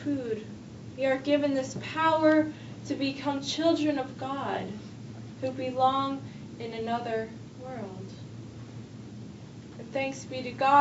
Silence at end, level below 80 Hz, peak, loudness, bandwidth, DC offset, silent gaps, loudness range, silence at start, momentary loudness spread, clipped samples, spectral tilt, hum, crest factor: 0 s; -64 dBFS; -8 dBFS; -29 LUFS; 8 kHz; under 0.1%; none; 10 LU; 0 s; 18 LU; under 0.1%; -5.5 dB/octave; none; 22 dB